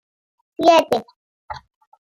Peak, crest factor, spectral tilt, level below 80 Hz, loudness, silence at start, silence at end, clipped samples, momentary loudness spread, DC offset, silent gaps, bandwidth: -2 dBFS; 20 dB; -3.5 dB/octave; -60 dBFS; -17 LUFS; 0.6 s; 0.6 s; under 0.1%; 22 LU; under 0.1%; 1.16-1.48 s; 15.5 kHz